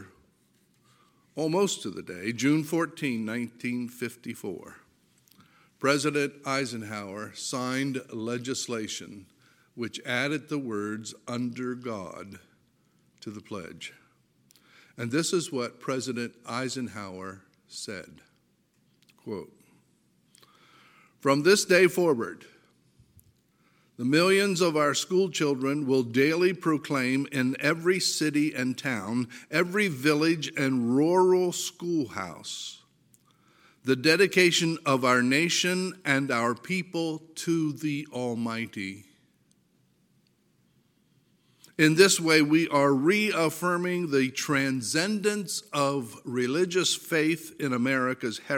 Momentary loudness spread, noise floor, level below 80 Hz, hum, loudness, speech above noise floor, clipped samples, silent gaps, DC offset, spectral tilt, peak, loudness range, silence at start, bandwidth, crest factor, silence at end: 16 LU; -68 dBFS; -76 dBFS; none; -26 LUFS; 42 dB; under 0.1%; none; under 0.1%; -4 dB/octave; -6 dBFS; 13 LU; 0 s; 17 kHz; 22 dB; 0 s